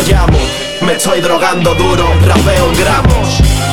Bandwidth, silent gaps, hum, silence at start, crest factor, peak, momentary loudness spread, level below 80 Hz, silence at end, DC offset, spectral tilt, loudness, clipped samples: 17.5 kHz; none; none; 0 s; 10 dB; 0 dBFS; 4 LU; -16 dBFS; 0 s; 6%; -5 dB/octave; -10 LUFS; under 0.1%